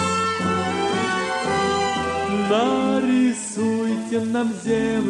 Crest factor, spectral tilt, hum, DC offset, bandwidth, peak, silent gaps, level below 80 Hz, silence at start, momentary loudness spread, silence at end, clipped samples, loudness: 14 dB; -4.5 dB/octave; none; under 0.1%; 11.5 kHz; -8 dBFS; none; -52 dBFS; 0 s; 4 LU; 0 s; under 0.1%; -21 LUFS